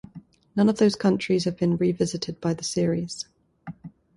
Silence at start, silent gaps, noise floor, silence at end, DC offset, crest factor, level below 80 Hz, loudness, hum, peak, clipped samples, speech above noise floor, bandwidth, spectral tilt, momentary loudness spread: 0.15 s; none; -48 dBFS; 0.25 s; under 0.1%; 16 dB; -58 dBFS; -24 LUFS; none; -8 dBFS; under 0.1%; 24 dB; 11.5 kHz; -6 dB/octave; 21 LU